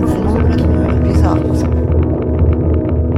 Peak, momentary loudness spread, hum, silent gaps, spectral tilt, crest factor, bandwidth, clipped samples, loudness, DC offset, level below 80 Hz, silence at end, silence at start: -2 dBFS; 2 LU; none; none; -9 dB/octave; 12 dB; 10.5 kHz; under 0.1%; -14 LUFS; under 0.1%; -18 dBFS; 0 s; 0 s